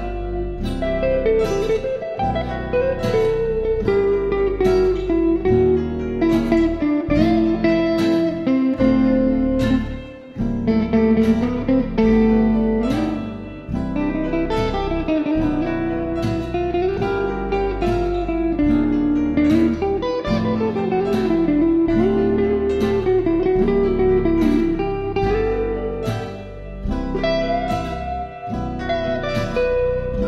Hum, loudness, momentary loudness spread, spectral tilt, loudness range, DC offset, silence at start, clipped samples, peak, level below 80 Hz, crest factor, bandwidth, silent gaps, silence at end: none; -19 LUFS; 8 LU; -8 dB/octave; 4 LU; under 0.1%; 0 s; under 0.1%; -4 dBFS; -32 dBFS; 14 dB; 12.5 kHz; none; 0 s